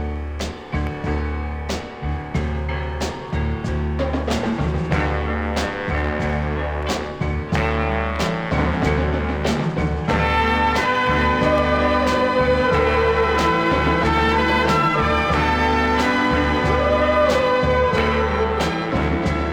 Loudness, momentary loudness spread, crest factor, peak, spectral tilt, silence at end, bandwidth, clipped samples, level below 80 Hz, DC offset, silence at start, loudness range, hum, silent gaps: -20 LUFS; 8 LU; 14 dB; -6 dBFS; -6 dB/octave; 0 s; 12.5 kHz; under 0.1%; -28 dBFS; under 0.1%; 0 s; 7 LU; none; none